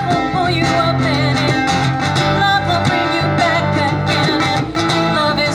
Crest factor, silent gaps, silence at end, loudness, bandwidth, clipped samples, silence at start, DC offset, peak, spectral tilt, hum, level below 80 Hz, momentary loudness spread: 12 dB; none; 0 s; -15 LUFS; over 20 kHz; under 0.1%; 0 s; 0.1%; -4 dBFS; -5 dB/octave; none; -40 dBFS; 2 LU